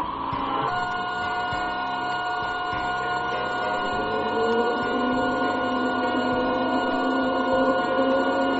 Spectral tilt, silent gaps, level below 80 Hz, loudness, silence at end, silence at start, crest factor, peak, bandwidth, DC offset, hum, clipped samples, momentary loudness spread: -2.5 dB/octave; none; -50 dBFS; -24 LUFS; 0 s; 0 s; 14 dB; -10 dBFS; 7.8 kHz; under 0.1%; none; under 0.1%; 5 LU